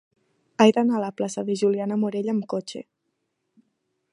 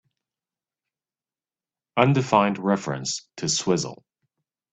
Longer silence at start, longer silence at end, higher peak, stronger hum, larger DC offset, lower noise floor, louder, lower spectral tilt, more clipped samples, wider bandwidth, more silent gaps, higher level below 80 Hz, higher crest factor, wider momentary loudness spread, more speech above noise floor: second, 0.6 s vs 1.95 s; first, 1.3 s vs 0.8 s; about the same, -2 dBFS vs -2 dBFS; neither; neither; second, -77 dBFS vs under -90 dBFS; about the same, -23 LUFS vs -23 LUFS; about the same, -5.5 dB/octave vs -4.5 dB/octave; neither; first, 11 kHz vs 9.2 kHz; neither; second, -76 dBFS vs -64 dBFS; about the same, 22 dB vs 24 dB; first, 16 LU vs 10 LU; second, 54 dB vs over 67 dB